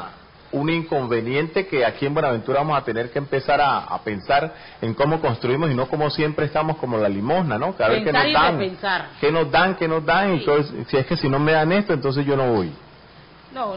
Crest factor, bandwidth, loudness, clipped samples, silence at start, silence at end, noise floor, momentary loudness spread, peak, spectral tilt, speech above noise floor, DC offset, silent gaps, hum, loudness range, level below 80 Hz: 16 dB; 5.4 kHz; -21 LUFS; under 0.1%; 0 s; 0 s; -46 dBFS; 7 LU; -4 dBFS; -11 dB/octave; 26 dB; 0.3%; none; none; 3 LU; -50 dBFS